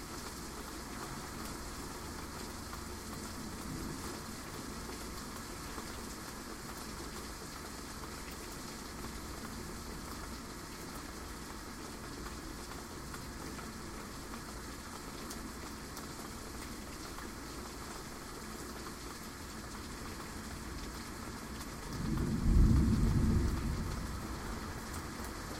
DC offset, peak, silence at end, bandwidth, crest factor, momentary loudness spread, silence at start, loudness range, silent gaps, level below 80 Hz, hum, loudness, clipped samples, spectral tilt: under 0.1%; -16 dBFS; 0 s; 16 kHz; 22 dB; 10 LU; 0 s; 11 LU; none; -44 dBFS; none; -41 LUFS; under 0.1%; -5 dB/octave